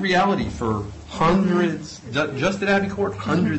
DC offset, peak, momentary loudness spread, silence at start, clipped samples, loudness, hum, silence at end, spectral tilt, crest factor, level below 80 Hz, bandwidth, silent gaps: under 0.1%; -8 dBFS; 8 LU; 0 s; under 0.1%; -22 LUFS; none; 0 s; -6 dB/octave; 14 dB; -42 dBFS; 8.4 kHz; none